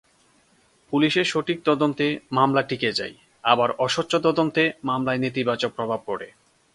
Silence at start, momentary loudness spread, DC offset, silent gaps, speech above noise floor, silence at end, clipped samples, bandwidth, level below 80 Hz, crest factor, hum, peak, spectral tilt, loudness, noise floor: 0.9 s; 8 LU; under 0.1%; none; 38 dB; 0.45 s; under 0.1%; 11.5 kHz; -64 dBFS; 22 dB; none; -2 dBFS; -5 dB/octave; -23 LUFS; -61 dBFS